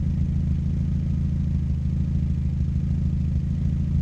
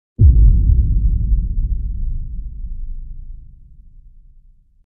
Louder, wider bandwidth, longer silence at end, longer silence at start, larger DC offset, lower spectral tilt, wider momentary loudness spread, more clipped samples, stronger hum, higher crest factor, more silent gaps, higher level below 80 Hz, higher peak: second, -25 LUFS vs -17 LUFS; first, 6.4 kHz vs 0.6 kHz; second, 0 s vs 1.25 s; second, 0 s vs 0.2 s; neither; second, -10 dB/octave vs -16 dB/octave; second, 1 LU vs 22 LU; neither; neither; second, 10 dB vs 16 dB; neither; second, -30 dBFS vs -16 dBFS; second, -12 dBFS vs 0 dBFS